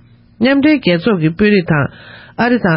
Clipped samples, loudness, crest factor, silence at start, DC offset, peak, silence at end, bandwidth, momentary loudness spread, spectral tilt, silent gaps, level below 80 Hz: under 0.1%; -13 LUFS; 12 dB; 0.4 s; under 0.1%; 0 dBFS; 0 s; 5.8 kHz; 6 LU; -12 dB/octave; none; -42 dBFS